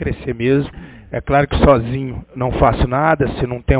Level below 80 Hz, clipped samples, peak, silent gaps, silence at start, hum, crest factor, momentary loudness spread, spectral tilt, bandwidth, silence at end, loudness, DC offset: -26 dBFS; under 0.1%; 0 dBFS; none; 0 s; none; 16 dB; 13 LU; -11.5 dB/octave; 4 kHz; 0 s; -17 LUFS; under 0.1%